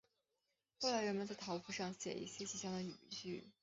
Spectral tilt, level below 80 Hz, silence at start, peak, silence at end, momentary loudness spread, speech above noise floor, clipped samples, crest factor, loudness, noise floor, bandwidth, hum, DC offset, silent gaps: -3.5 dB/octave; -82 dBFS; 0.8 s; -26 dBFS; 0.1 s; 9 LU; 44 dB; under 0.1%; 20 dB; -44 LUFS; -88 dBFS; 8 kHz; none; under 0.1%; none